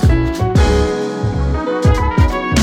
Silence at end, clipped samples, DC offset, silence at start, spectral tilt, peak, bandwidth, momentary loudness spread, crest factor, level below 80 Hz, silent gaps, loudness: 0 s; under 0.1%; under 0.1%; 0 s; -6.5 dB/octave; -2 dBFS; 12.5 kHz; 5 LU; 12 dB; -18 dBFS; none; -15 LUFS